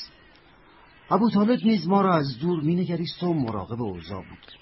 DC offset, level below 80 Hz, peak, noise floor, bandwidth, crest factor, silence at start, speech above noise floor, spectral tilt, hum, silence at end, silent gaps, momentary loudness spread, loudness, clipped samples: under 0.1%; -58 dBFS; -8 dBFS; -54 dBFS; 5.8 kHz; 16 dB; 0 s; 30 dB; -11 dB/octave; none; 0.05 s; none; 16 LU; -24 LUFS; under 0.1%